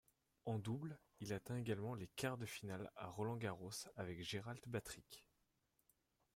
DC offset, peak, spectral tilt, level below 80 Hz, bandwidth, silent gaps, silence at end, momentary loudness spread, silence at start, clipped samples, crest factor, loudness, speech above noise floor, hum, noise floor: under 0.1%; -30 dBFS; -5 dB/octave; -76 dBFS; 16 kHz; none; 1.15 s; 9 LU; 0.45 s; under 0.1%; 18 dB; -48 LUFS; 37 dB; none; -84 dBFS